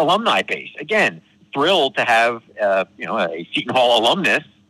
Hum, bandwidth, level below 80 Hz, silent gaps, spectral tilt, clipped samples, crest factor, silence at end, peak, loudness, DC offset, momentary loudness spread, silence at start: none; 14 kHz; -66 dBFS; none; -3.5 dB/octave; under 0.1%; 12 dB; 0.25 s; -6 dBFS; -18 LUFS; under 0.1%; 9 LU; 0 s